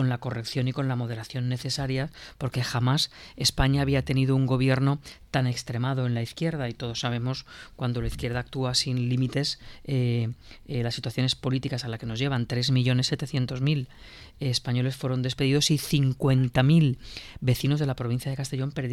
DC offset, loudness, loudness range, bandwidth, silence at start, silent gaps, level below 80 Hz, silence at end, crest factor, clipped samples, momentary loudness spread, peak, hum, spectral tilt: under 0.1%; -27 LUFS; 4 LU; 15 kHz; 0 s; none; -46 dBFS; 0 s; 18 dB; under 0.1%; 9 LU; -8 dBFS; none; -5.5 dB/octave